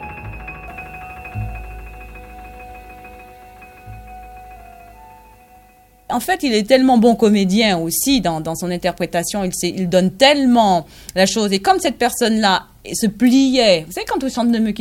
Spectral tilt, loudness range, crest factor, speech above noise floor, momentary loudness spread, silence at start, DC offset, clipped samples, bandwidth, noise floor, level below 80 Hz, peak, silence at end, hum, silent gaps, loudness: -4 dB/octave; 18 LU; 18 dB; 33 dB; 24 LU; 0 s; under 0.1%; under 0.1%; 17 kHz; -49 dBFS; -42 dBFS; 0 dBFS; 0 s; none; none; -16 LUFS